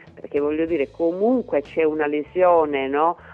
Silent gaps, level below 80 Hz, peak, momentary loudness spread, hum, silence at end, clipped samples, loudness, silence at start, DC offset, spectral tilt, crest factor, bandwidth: none; -54 dBFS; -6 dBFS; 6 LU; none; 0 s; under 0.1%; -21 LUFS; 0.05 s; under 0.1%; -8 dB/octave; 16 dB; 5 kHz